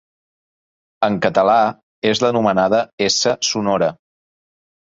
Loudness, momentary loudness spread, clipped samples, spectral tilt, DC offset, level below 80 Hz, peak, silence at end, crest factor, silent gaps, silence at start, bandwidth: -17 LUFS; 7 LU; under 0.1%; -3.5 dB/octave; under 0.1%; -56 dBFS; -2 dBFS; 0.95 s; 16 dB; 1.83-2.02 s, 2.93-2.98 s; 1 s; 7.8 kHz